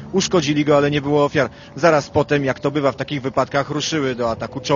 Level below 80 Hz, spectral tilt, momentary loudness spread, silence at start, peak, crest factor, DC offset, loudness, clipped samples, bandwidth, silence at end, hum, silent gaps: -50 dBFS; -5 dB/octave; 7 LU; 0 s; 0 dBFS; 18 dB; under 0.1%; -19 LUFS; under 0.1%; 7.4 kHz; 0 s; none; none